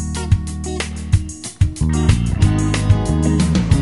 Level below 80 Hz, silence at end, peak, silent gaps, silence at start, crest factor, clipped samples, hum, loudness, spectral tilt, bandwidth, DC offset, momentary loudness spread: -24 dBFS; 0 s; -2 dBFS; none; 0 s; 16 dB; under 0.1%; none; -18 LUFS; -6 dB/octave; 11.5 kHz; 0.3%; 8 LU